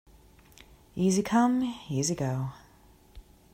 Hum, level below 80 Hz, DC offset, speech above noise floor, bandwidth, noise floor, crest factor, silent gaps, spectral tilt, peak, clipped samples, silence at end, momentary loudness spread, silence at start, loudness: none; -58 dBFS; under 0.1%; 31 dB; 16 kHz; -58 dBFS; 18 dB; none; -5.5 dB/octave; -12 dBFS; under 0.1%; 0.35 s; 11 LU; 0.95 s; -28 LUFS